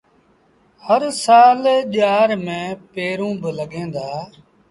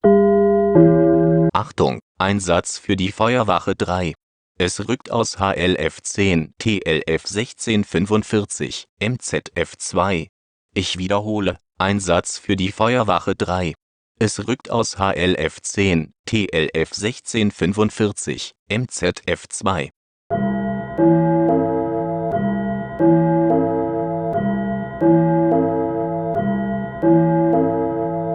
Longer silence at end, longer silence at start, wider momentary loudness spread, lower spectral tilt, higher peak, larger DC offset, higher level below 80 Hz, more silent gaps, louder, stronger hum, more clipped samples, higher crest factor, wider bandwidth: first, 0.45 s vs 0 s; first, 0.85 s vs 0.05 s; first, 17 LU vs 9 LU; about the same, -4.5 dB/octave vs -5.5 dB/octave; about the same, -2 dBFS vs 0 dBFS; neither; second, -62 dBFS vs -46 dBFS; second, none vs 2.02-2.15 s, 4.23-4.55 s, 8.89-8.97 s, 10.29-10.69 s, 13.82-14.15 s, 16.19-16.24 s, 18.59-18.66 s, 19.96-20.30 s; about the same, -17 LUFS vs -19 LUFS; neither; neither; about the same, 16 dB vs 18 dB; about the same, 11.5 kHz vs 10.5 kHz